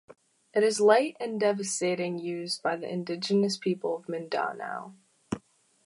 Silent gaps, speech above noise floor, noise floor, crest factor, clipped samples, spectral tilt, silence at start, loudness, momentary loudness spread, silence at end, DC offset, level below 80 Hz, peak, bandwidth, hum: none; 26 dB; -54 dBFS; 22 dB; under 0.1%; -4 dB/octave; 0.1 s; -29 LUFS; 16 LU; 0.5 s; under 0.1%; -70 dBFS; -8 dBFS; 11.5 kHz; none